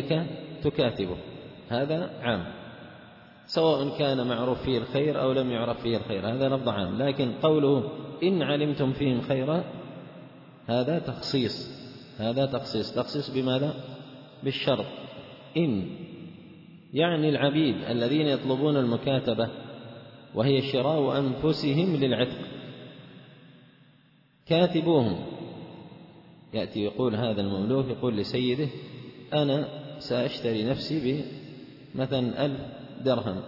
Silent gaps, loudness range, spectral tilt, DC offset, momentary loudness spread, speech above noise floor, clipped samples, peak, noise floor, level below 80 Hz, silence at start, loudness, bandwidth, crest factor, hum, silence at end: none; 4 LU; -8 dB/octave; under 0.1%; 19 LU; 35 dB; under 0.1%; -10 dBFS; -61 dBFS; -60 dBFS; 0 s; -27 LUFS; 5.8 kHz; 18 dB; none; 0 s